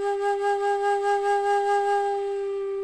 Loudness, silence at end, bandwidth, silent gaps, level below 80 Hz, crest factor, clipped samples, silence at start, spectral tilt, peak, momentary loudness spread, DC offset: -24 LUFS; 0 s; 10.5 kHz; none; -64 dBFS; 10 dB; under 0.1%; 0 s; -2.5 dB/octave; -14 dBFS; 5 LU; under 0.1%